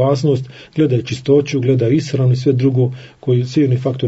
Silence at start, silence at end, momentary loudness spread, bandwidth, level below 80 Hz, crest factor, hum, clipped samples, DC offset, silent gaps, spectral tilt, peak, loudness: 0 s; 0 s; 5 LU; 8 kHz; -56 dBFS; 14 dB; none; under 0.1%; under 0.1%; none; -8 dB/octave; -2 dBFS; -16 LUFS